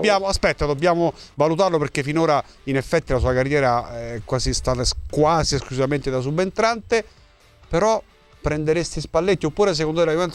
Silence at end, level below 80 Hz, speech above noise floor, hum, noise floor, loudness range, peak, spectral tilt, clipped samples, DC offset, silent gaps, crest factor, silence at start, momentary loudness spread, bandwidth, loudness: 0 s; -36 dBFS; 31 dB; none; -51 dBFS; 2 LU; -4 dBFS; -5 dB/octave; under 0.1%; under 0.1%; none; 16 dB; 0 s; 6 LU; 13 kHz; -21 LUFS